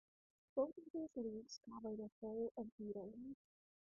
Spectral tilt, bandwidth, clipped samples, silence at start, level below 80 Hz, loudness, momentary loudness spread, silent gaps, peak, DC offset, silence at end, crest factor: -1.5 dB/octave; 1.9 kHz; under 0.1%; 0.55 s; -80 dBFS; -49 LUFS; 11 LU; 0.90-0.94 s, 2.12-2.22 s, 2.51-2.55 s, 2.72-2.78 s; -28 dBFS; under 0.1%; 0.5 s; 20 dB